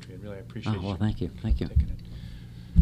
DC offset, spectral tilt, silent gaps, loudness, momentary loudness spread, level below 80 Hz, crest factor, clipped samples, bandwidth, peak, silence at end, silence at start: under 0.1%; -8.5 dB/octave; none; -31 LUFS; 15 LU; -34 dBFS; 24 dB; under 0.1%; 9 kHz; -4 dBFS; 0 s; 0 s